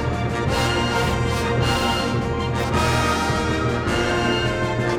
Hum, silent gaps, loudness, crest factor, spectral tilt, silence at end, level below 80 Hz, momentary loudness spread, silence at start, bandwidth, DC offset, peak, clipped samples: none; none; -21 LUFS; 12 dB; -5 dB/octave; 0 s; -32 dBFS; 3 LU; 0 s; 16.5 kHz; under 0.1%; -8 dBFS; under 0.1%